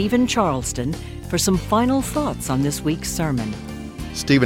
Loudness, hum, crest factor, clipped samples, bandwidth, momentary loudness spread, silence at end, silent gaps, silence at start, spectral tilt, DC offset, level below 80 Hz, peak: -22 LUFS; none; 16 dB; under 0.1%; 17 kHz; 11 LU; 0 s; none; 0 s; -5 dB/octave; under 0.1%; -36 dBFS; -4 dBFS